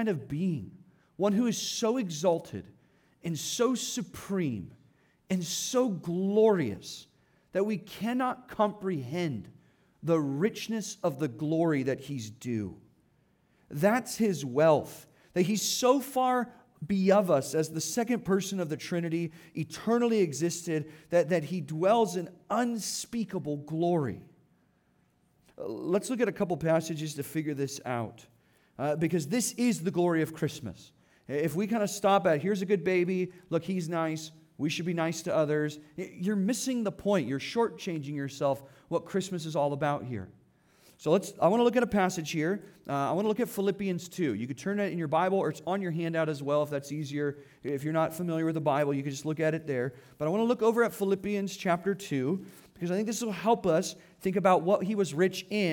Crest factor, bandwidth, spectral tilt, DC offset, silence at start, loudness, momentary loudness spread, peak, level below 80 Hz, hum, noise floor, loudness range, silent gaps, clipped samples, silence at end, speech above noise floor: 18 dB; 19 kHz; -5.5 dB/octave; under 0.1%; 0 s; -30 LUFS; 11 LU; -12 dBFS; -68 dBFS; none; -69 dBFS; 4 LU; none; under 0.1%; 0 s; 40 dB